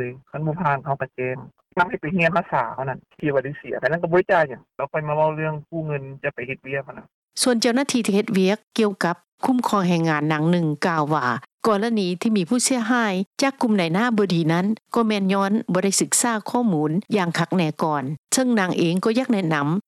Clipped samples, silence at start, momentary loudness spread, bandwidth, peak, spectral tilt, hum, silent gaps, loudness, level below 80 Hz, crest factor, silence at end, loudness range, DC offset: under 0.1%; 0 s; 9 LU; 14 kHz; -6 dBFS; -5 dB/octave; none; 7.14-7.22 s, 8.67-8.71 s, 9.28-9.38 s, 11.54-11.58 s, 13.26-13.31 s, 18.18-18.24 s; -22 LUFS; -62 dBFS; 16 dB; 0.05 s; 3 LU; under 0.1%